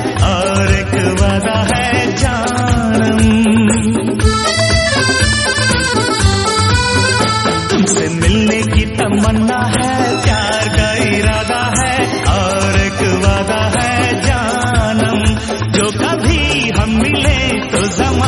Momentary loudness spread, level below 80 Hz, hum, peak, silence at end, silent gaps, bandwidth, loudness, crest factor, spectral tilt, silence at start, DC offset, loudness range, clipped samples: 3 LU; -22 dBFS; none; 0 dBFS; 0 s; none; 11.5 kHz; -13 LUFS; 12 dB; -4.5 dB/octave; 0 s; under 0.1%; 2 LU; under 0.1%